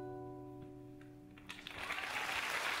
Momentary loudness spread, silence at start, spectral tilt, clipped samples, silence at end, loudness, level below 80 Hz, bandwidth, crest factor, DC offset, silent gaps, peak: 18 LU; 0 s; -2.5 dB/octave; under 0.1%; 0 s; -41 LUFS; -68 dBFS; 16 kHz; 18 dB; under 0.1%; none; -26 dBFS